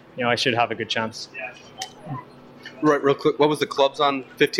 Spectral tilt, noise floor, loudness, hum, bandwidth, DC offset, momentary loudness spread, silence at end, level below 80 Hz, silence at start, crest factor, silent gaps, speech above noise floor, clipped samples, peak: -4.5 dB/octave; -43 dBFS; -22 LUFS; none; 14.5 kHz; under 0.1%; 16 LU; 0 s; -66 dBFS; 0.15 s; 18 dB; none; 21 dB; under 0.1%; -6 dBFS